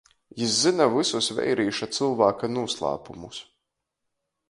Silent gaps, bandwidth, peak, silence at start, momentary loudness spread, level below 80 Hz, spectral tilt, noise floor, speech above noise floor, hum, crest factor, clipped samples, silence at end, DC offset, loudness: none; 11.5 kHz; -6 dBFS; 0.35 s; 18 LU; -62 dBFS; -3.5 dB/octave; -81 dBFS; 57 dB; none; 20 dB; under 0.1%; 1.1 s; under 0.1%; -24 LUFS